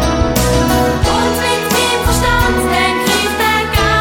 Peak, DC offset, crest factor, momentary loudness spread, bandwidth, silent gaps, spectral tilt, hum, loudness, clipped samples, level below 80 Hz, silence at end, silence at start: 0 dBFS; under 0.1%; 12 dB; 1 LU; over 20 kHz; none; -4 dB/octave; none; -13 LUFS; under 0.1%; -22 dBFS; 0 s; 0 s